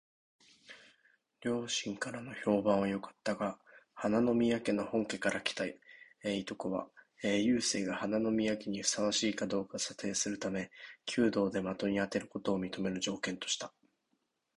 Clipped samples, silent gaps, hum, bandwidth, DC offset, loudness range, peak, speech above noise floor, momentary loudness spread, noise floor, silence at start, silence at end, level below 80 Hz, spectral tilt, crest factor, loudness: under 0.1%; none; none; 11.5 kHz; under 0.1%; 3 LU; -16 dBFS; 47 dB; 10 LU; -81 dBFS; 0.7 s; 0.9 s; -68 dBFS; -4 dB/octave; 20 dB; -34 LUFS